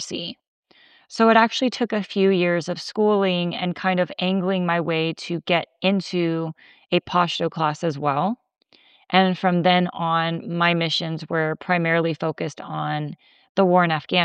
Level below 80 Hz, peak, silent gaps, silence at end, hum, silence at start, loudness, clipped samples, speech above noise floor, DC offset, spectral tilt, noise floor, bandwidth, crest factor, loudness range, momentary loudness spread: -70 dBFS; -2 dBFS; 0.48-0.63 s, 13.49-13.55 s; 0 s; none; 0 s; -22 LUFS; under 0.1%; 33 dB; under 0.1%; -6 dB/octave; -54 dBFS; 9.2 kHz; 20 dB; 3 LU; 10 LU